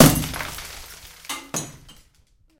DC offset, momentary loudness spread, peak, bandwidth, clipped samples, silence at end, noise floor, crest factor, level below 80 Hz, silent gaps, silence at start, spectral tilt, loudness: under 0.1%; 16 LU; 0 dBFS; 17 kHz; under 0.1%; 0.9 s; -59 dBFS; 24 dB; -40 dBFS; none; 0 s; -4 dB/octave; -25 LUFS